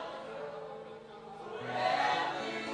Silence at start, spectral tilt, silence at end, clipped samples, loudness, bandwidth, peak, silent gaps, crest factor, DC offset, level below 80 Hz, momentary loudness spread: 0 s; -3.5 dB/octave; 0 s; under 0.1%; -35 LUFS; 10.5 kHz; -18 dBFS; none; 18 dB; under 0.1%; -74 dBFS; 18 LU